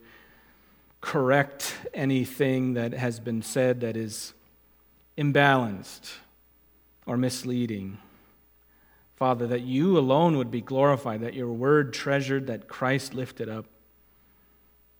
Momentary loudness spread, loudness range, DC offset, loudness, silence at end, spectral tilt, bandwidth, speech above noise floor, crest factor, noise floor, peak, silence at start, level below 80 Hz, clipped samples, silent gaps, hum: 16 LU; 6 LU; under 0.1%; -26 LUFS; 1.35 s; -6 dB/octave; 19 kHz; 35 dB; 24 dB; -61 dBFS; -4 dBFS; 1 s; -66 dBFS; under 0.1%; none; none